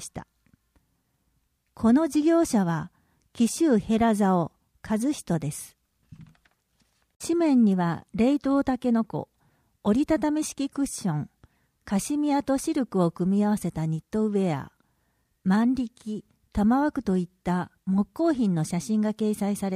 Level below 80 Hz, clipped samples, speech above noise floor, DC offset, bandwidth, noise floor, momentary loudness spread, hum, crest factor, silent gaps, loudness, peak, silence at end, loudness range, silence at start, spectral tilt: -54 dBFS; under 0.1%; 47 dB; under 0.1%; 15.5 kHz; -72 dBFS; 12 LU; none; 16 dB; 7.16-7.20 s; -25 LUFS; -10 dBFS; 0 s; 3 LU; 0 s; -6.5 dB/octave